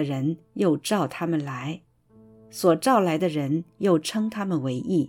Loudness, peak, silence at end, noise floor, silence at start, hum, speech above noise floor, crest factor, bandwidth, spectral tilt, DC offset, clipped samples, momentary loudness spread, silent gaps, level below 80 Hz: -25 LUFS; -8 dBFS; 0 s; -54 dBFS; 0 s; none; 30 dB; 18 dB; 17.5 kHz; -6 dB/octave; under 0.1%; under 0.1%; 10 LU; none; -68 dBFS